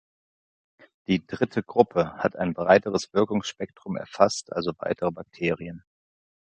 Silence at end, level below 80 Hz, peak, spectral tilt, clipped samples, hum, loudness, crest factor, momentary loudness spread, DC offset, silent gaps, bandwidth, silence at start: 0.8 s; -58 dBFS; -2 dBFS; -5.5 dB/octave; under 0.1%; none; -25 LUFS; 24 dB; 14 LU; under 0.1%; none; 9.2 kHz; 1.1 s